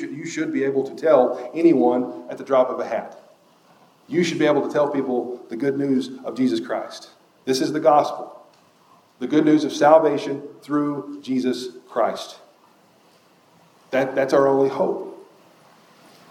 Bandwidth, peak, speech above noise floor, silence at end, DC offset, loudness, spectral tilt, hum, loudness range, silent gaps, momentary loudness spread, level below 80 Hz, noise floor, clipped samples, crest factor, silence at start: 15 kHz; 0 dBFS; 35 dB; 1.05 s; under 0.1%; -21 LUFS; -5.5 dB/octave; none; 6 LU; none; 14 LU; -82 dBFS; -56 dBFS; under 0.1%; 22 dB; 0 s